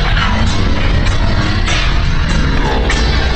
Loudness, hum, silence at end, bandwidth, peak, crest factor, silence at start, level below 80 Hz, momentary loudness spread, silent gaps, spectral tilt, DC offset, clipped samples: -14 LUFS; none; 0 s; 8.8 kHz; -2 dBFS; 10 dB; 0 s; -14 dBFS; 2 LU; none; -5 dB/octave; under 0.1%; under 0.1%